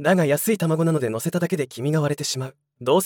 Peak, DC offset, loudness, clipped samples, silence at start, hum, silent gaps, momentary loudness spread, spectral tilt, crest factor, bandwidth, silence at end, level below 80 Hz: -6 dBFS; under 0.1%; -23 LUFS; under 0.1%; 0 s; none; none; 8 LU; -5.5 dB/octave; 16 dB; 18 kHz; 0 s; -68 dBFS